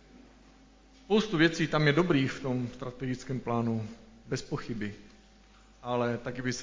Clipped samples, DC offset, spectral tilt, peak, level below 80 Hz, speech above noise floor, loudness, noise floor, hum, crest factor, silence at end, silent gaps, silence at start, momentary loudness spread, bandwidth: under 0.1%; under 0.1%; -6 dB/octave; -10 dBFS; -58 dBFS; 28 dB; -30 LUFS; -58 dBFS; none; 20 dB; 0 s; none; 0.15 s; 13 LU; 7.6 kHz